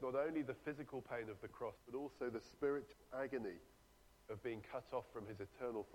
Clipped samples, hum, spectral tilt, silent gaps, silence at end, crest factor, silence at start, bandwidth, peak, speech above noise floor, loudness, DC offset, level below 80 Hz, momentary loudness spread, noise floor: under 0.1%; none; -7 dB/octave; none; 0 s; 18 dB; 0 s; 17 kHz; -30 dBFS; 23 dB; -47 LUFS; under 0.1%; -72 dBFS; 9 LU; -69 dBFS